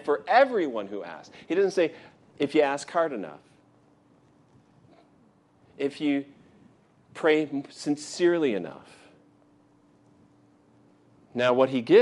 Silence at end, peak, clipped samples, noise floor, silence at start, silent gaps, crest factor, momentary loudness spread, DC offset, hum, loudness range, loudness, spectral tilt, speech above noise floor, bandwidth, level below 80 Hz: 0 s; -6 dBFS; under 0.1%; -61 dBFS; 0 s; none; 22 dB; 18 LU; under 0.1%; none; 8 LU; -26 LUFS; -5 dB/octave; 36 dB; 11.5 kHz; -78 dBFS